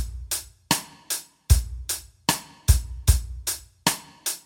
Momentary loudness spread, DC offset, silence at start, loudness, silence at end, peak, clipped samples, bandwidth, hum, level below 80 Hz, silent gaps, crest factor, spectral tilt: 7 LU; under 0.1%; 0 s; -26 LUFS; 0.05 s; -2 dBFS; under 0.1%; 19 kHz; none; -30 dBFS; none; 22 dB; -3 dB/octave